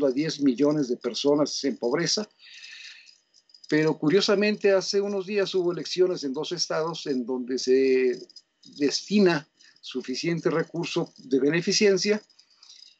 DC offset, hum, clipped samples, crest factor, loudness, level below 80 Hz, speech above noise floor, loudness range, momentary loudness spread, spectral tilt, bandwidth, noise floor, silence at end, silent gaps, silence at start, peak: under 0.1%; none; under 0.1%; 16 dB; -25 LUFS; -80 dBFS; 34 dB; 3 LU; 10 LU; -4.5 dB/octave; 8.2 kHz; -59 dBFS; 0.25 s; none; 0 s; -10 dBFS